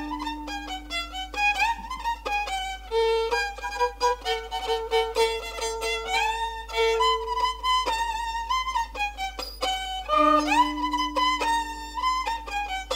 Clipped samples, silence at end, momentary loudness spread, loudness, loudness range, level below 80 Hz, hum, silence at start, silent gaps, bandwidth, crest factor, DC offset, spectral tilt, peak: under 0.1%; 0 s; 9 LU; -26 LUFS; 2 LU; -44 dBFS; none; 0 s; none; 16 kHz; 18 dB; under 0.1%; -2.5 dB/octave; -8 dBFS